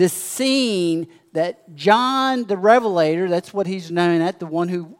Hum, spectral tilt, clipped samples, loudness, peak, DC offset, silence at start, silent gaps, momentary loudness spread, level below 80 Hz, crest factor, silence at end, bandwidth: none; -4.5 dB/octave; under 0.1%; -19 LUFS; 0 dBFS; under 0.1%; 0 s; none; 9 LU; -74 dBFS; 18 dB; 0.05 s; 16.5 kHz